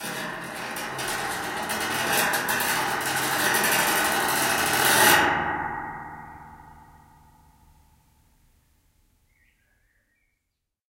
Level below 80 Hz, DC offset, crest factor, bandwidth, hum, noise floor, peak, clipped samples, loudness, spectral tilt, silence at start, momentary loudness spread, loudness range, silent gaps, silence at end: -56 dBFS; under 0.1%; 22 dB; 17 kHz; none; -80 dBFS; -4 dBFS; under 0.1%; -23 LUFS; -1.5 dB/octave; 0 s; 16 LU; 11 LU; none; 4.1 s